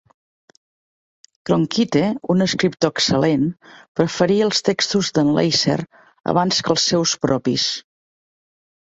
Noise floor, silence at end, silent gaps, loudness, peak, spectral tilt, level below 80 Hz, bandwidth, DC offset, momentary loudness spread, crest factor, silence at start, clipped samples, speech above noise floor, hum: under -90 dBFS; 1.05 s; 3.88-3.95 s; -18 LUFS; -2 dBFS; -4.5 dB/octave; -54 dBFS; 8.2 kHz; under 0.1%; 7 LU; 18 dB; 1.45 s; under 0.1%; over 72 dB; none